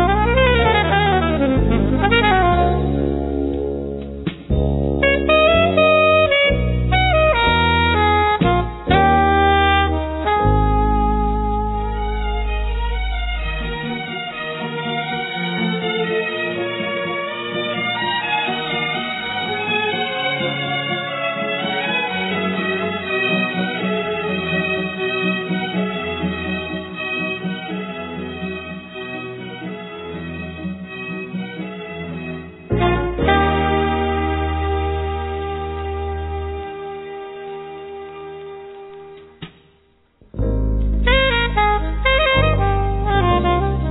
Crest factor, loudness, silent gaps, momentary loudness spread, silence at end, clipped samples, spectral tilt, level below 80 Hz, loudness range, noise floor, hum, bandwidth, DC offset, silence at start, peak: 18 dB; -19 LUFS; none; 15 LU; 0 s; under 0.1%; -9 dB/octave; -26 dBFS; 13 LU; -57 dBFS; none; 4.1 kHz; under 0.1%; 0 s; 0 dBFS